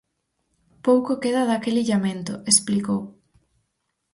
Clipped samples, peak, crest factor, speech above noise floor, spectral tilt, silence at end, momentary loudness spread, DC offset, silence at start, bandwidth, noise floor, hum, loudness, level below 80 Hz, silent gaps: under 0.1%; -4 dBFS; 20 dB; 55 dB; -4 dB/octave; 1.05 s; 10 LU; under 0.1%; 0.85 s; 11.5 kHz; -76 dBFS; none; -22 LUFS; -64 dBFS; none